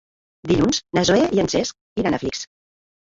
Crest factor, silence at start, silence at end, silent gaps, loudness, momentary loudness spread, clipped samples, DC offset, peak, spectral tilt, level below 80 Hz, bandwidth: 18 dB; 0.45 s; 0.7 s; 1.81-1.96 s; -20 LUFS; 13 LU; under 0.1%; under 0.1%; -4 dBFS; -4.5 dB/octave; -46 dBFS; 7.8 kHz